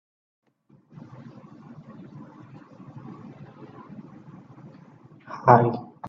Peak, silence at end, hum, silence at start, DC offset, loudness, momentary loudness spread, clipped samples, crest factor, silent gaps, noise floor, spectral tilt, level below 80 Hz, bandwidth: 0 dBFS; 0 s; none; 2.15 s; under 0.1%; -20 LUFS; 29 LU; under 0.1%; 28 dB; none; -59 dBFS; -8 dB/octave; -66 dBFS; 6.4 kHz